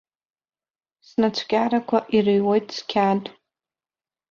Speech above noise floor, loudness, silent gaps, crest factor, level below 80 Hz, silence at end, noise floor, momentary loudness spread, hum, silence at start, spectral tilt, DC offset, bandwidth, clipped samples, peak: over 69 dB; -22 LUFS; none; 18 dB; -64 dBFS; 1 s; under -90 dBFS; 7 LU; none; 1.2 s; -6 dB/octave; under 0.1%; 7.2 kHz; under 0.1%; -6 dBFS